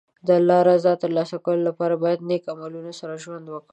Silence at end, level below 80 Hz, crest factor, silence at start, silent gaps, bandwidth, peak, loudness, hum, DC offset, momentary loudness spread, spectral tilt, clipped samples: 0.1 s; -74 dBFS; 16 dB; 0.25 s; none; 8.6 kHz; -4 dBFS; -20 LUFS; none; under 0.1%; 18 LU; -7 dB/octave; under 0.1%